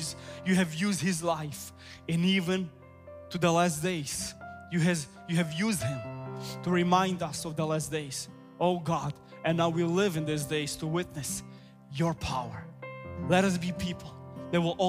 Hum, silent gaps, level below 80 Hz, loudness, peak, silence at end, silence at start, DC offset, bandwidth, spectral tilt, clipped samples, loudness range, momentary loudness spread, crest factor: none; none; -58 dBFS; -30 LUFS; -10 dBFS; 0 s; 0 s; under 0.1%; 16 kHz; -5 dB/octave; under 0.1%; 2 LU; 15 LU; 20 dB